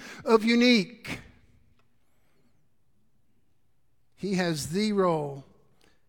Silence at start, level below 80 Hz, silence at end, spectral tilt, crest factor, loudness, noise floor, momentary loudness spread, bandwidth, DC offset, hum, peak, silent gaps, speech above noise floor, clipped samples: 0 s; -64 dBFS; 0.65 s; -5 dB/octave; 22 dB; -25 LUFS; -74 dBFS; 18 LU; 17.5 kHz; under 0.1%; none; -8 dBFS; none; 49 dB; under 0.1%